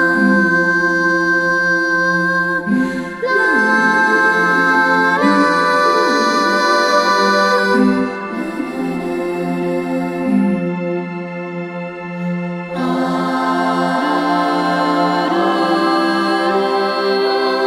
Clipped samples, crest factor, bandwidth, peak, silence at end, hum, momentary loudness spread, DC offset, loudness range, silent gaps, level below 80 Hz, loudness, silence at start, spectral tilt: under 0.1%; 14 dB; 15.5 kHz; -2 dBFS; 0 s; none; 10 LU; under 0.1%; 7 LU; none; -54 dBFS; -15 LUFS; 0 s; -5 dB/octave